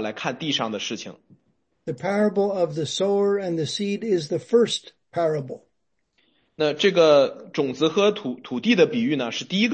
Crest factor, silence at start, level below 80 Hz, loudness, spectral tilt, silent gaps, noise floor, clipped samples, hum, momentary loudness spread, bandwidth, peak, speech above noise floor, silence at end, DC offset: 18 dB; 0 s; -72 dBFS; -22 LUFS; -5 dB/octave; none; -75 dBFS; under 0.1%; none; 11 LU; 8.8 kHz; -4 dBFS; 53 dB; 0 s; under 0.1%